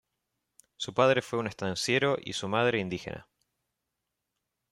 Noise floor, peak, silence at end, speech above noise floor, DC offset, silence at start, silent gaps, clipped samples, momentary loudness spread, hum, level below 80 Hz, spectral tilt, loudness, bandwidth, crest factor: -85 dBFS; -8 dBFS; 1.5 s; 56 dB; under 0.1%; 0.8 s; none; under 0.1%; 13 LU; none; -66 dBFS; -4.5 dB/octave; -29 LUFS; 13.5 kHz; 22 dB